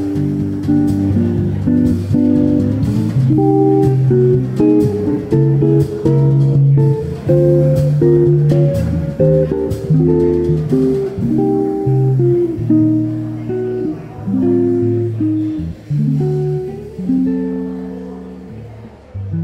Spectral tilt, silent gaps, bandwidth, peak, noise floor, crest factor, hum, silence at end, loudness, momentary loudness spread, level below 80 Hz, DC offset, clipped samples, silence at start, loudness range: -10.5 dB/octave; none; 8.4 kHz; -2 dBFS; -34 dBFS; 12 dB; none; 0 s; -14 LUFS; 11 LU; -36 dBFS; under 0.1%; under 0.1%; 0 s; 5 LU